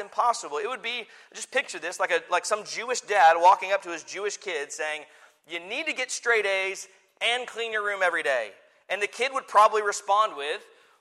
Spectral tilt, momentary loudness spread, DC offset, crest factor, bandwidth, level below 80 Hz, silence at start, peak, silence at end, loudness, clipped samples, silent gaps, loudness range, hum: 0 dB/octave; 14 LU; under 0.1%; 20 dB; 14 kHz; -84 dBFS; 0 s; -6 dBFS; 0.4 s; -25 LUFS; under 0.1%; none; 4 LU; none